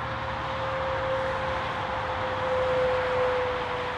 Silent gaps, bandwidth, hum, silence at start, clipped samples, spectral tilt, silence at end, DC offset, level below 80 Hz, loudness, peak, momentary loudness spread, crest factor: none; 9.8 kHz; none; 0 s; under 0.1%; -5.5 dB/octave; 0 s; under 0.1%; -46 dBFS; -28 LUFS; -14 dBFS; 5 LU; 14 dB